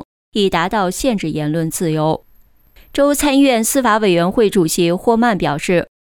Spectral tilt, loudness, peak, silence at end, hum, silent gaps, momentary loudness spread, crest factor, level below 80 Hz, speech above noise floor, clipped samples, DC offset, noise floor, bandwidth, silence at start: -4.5 dB/octave; -16 LUFS; -2 dBFS; 0.15 s; none; 0.05-0.32 s; 7 LU; 12 dB; -42 dBFS; 34 dB; under 0.1%; under 0.1%; -49 dBFS; 19.5 kHz; 0 s